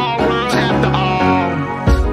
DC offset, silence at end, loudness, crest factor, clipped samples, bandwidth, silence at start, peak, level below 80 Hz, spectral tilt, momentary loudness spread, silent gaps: under 0.1%; 0 s; -15 LUFS; 14 dB; under 0.1%; 14.5 kHz; 0 s; 0 dBFS; -24 dBFS; -6.5 dB/octave; 3 LU; none